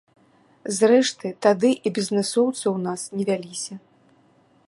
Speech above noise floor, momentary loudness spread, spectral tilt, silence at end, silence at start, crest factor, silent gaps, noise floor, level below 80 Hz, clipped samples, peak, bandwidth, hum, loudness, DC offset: 37 dB; 14 LU; -4.5 dB/octave; 0.9 s; 0.65 s; 20 dB; none; -59 dBFS; -74 dBFS; under 0.1%; -4 dBFS; 11.5 kHz; none; -22 LUFS; under 0.1%